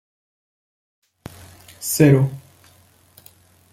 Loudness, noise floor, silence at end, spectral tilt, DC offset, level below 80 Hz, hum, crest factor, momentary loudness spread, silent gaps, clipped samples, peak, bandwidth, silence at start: -17 LUFS; -54 dBFS; 1.35 s; -6 dB/octave; under 0.1%; -56 dBFS; none; 20 dB; 26 LU; none; under 0.1%; -2 dBFS; 16 kHz; 1.8 s